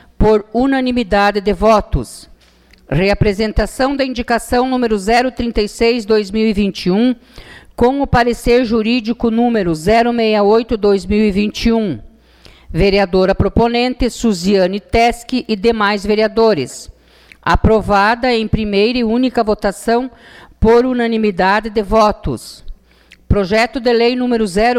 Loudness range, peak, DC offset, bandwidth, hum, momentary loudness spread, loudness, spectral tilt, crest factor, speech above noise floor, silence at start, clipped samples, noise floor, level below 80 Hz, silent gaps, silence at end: 2 LU; -2 dBFS; under 0.1%; 14.5 kHz; none; 6 LU; -14 LUFS; -6 dB/octave; 12 dB; 34 dB; 0.2 s; under 0.1%; -48 dBFS; -28 dBFS; none; 0 s